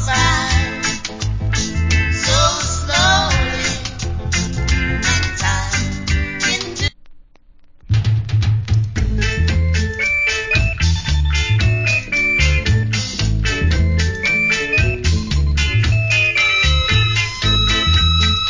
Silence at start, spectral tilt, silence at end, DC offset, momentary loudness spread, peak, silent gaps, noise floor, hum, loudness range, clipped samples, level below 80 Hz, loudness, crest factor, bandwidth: 0 s; -3.5 dB/octave; 0 s; under 0.1%; 7 LU; -2 dBFS; none; -45 dBFS; none; 5 LU; under 0.1%; -22 dBFS; -16 LUFS; 14 dB; 7.6 kHz